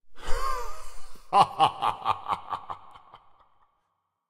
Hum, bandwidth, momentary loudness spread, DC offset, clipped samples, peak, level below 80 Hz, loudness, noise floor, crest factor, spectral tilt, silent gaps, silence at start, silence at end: none; 13.5 kHz; 19 LU; under 0.1%; under 0.1%; -6 dBFS; -40 dBFS; -27 LUFS; -78 dBFS; 22 dB; -3.5 dB/octave; none; 0.05 s; 1.15 s